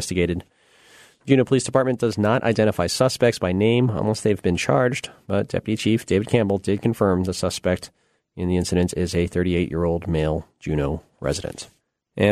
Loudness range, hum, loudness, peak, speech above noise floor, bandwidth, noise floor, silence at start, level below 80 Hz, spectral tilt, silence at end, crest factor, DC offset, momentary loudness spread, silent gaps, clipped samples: 4 LU; none; -22 LUFS; -2 dBFS; 31 dB; 13.5 kHz; -52 dBFS; 0 s; -42 dBFS; -6 dB/octave; 0 s; 18 dB; under 0.1%; 9 LU; none; under 0.1%